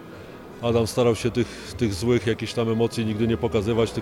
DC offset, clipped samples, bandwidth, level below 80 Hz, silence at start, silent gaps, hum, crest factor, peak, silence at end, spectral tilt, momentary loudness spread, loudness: under 0.1%; under 0.1%; 16 kHz; -46 dBFS; 0 s; none; none; 16 dB; -8 dBFS; 0 s; -6 dB/octave; 8 LU; -24 LUFS